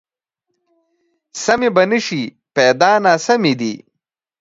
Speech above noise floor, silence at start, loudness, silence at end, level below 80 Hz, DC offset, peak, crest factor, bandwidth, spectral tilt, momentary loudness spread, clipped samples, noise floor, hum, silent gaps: 64 dB; 1.35 s; -15 LUFS; 0.65 s; -62 dBFS; under 0.1%; 0 dBFS; 18 dB; 7.8 kHz; -4 dB/octave; 12 LU; under 0.1%; -79 dBFS; none; none